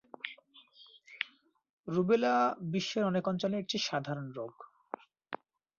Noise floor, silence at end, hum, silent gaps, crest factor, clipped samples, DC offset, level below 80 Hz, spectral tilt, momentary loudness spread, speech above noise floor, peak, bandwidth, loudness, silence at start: -65 dBFS; 0.45 s; none; 1.70-1.84 s; 22 dB; under 0.1%; under 0.1%; -76 dBFS; -4 dB/octave; 18 LU; 33 dB; -12 dBFS; 7.4 kHz; -33 LUFS; 0.25 s